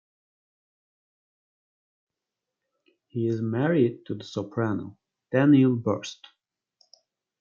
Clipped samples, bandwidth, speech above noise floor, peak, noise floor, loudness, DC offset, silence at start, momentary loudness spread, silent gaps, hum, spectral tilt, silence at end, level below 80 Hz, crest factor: under 0.1%; 7.4 kHz; 63 dB; -8 dBFS; -87 dBFS; -25 LUFS; under 0.1%; 3.15 s; 17 LU; none; none; -7.5 dB/octave; 1.3 s; -74 dBFS; 20 dB